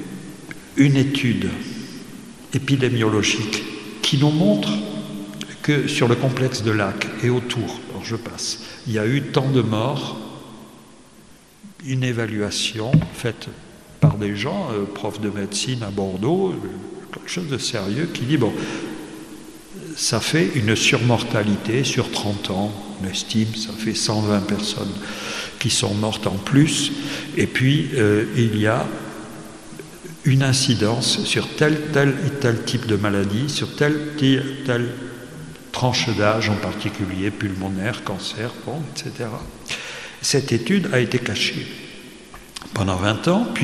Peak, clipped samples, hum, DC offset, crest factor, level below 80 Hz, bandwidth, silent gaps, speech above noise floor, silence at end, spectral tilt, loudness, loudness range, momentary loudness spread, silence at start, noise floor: -2 dBFS; under 0.1%; none; 0.2%; 20 dB; -52 dBFS; 13.5 kHz; none; 27 dB; 0 s; -5 dB/octave; -21 LUFS; 5 LU; 16 LU; 0 s; -48 dBFS